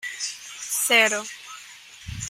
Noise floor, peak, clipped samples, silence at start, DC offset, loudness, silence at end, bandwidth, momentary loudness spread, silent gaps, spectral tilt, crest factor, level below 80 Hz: -45 dBFS; -6 dBFS; under 0.1%; 0 s; under 0.1%; -21 LUFS; 0 s; 16 kHz; 23 LU; none; -0.5 dB/octave; 22 dB; -52 dBFS